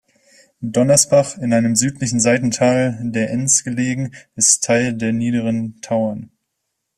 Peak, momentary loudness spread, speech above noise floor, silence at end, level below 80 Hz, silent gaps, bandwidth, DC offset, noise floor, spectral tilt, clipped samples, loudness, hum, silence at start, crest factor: 0 dBFS; 10 LU; 58 dB; 0.75 s; -56 dBFS; none; 14.5 kHz; under 0.1%; -75 dBFS; -4 dB/octave; under 0.1%; -17 LUFS; none; 0.6 s; 18 dB